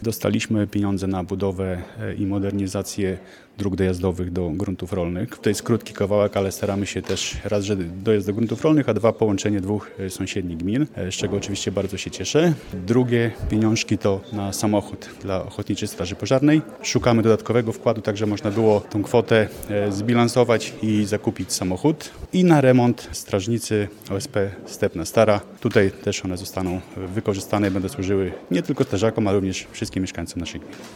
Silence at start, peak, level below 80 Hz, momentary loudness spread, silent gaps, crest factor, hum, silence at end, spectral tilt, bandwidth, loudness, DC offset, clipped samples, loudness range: 0 s; -2 dBFS; -46 dBFS; 9 LU; none; 20 dB; none; 0 s; -5.5 dB/octave; 18 kHz; -22 LUFS; under 0.1%; under 0.1%; 4 LU